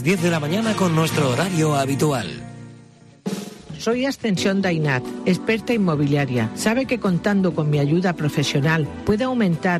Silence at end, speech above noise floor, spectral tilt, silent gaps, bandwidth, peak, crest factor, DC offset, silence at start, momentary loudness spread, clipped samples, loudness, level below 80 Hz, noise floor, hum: 0 s; 27 dB; -6 dB/octave; none; 14 kHz; -8 dBFS; 12 dB; under 0.1%; 0 s; 10 LU; under 0.1%; -21 LUFS; -50 dBFS; -47 dBFS; none